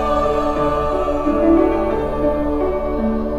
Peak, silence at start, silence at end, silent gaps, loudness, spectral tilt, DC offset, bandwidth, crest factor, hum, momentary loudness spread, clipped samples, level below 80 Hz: -4 dBFS; 0 s; 0 s; none; -18 LUFS; -8 dB/octave; under 0.1%; 13 kHz; 14 dB; none; 6 LU; under 0.1%; -28 dBFS